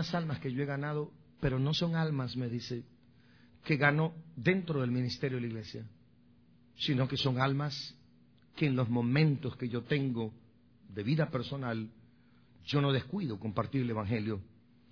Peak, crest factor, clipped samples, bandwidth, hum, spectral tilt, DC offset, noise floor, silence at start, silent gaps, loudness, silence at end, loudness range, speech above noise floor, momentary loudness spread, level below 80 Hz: -12 dBFS; 22 dB; under 0.1%; 5.4 kHz; none; -7 dB/octave; under 0.1%; -63 dBFS; 0 s; none; -33 LUFS; 0.45 s; 3 LU; 31 dB; 13 LU; -62 dBFS